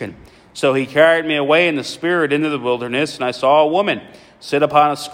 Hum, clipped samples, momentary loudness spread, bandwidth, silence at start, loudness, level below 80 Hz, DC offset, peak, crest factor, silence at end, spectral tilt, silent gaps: none; under 0.1%; 9 LU; 16 kHz; 0 s; -16 LUFS; -58 dBFS; under 0.1%; 0 dBFS; 16 dB; 0 s; -5 dB/octave; none